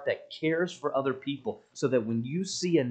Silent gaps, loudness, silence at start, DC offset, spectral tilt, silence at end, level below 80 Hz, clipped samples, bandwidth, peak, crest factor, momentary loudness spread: none; -30 LUFS; 0 s; under 0.1%; -5.5 dB/octave; 0 s; -76 dBFS; under 0.1%; 9.2 kHz; -12 dBFS; 18 dB; 7 LU